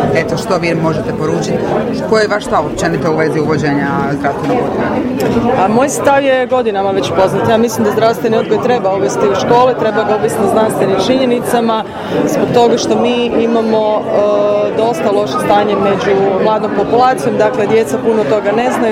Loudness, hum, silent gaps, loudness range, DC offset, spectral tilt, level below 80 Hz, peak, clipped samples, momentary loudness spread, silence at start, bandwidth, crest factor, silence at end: -12 LUFS; none; none; 2 LU; under 0.1%; -5.5 dB/octave; -42 dBFS; 0 dBFS; under 0.1%; 4 LU; 0 s; 16.5 kHz; 12 dB; 0 s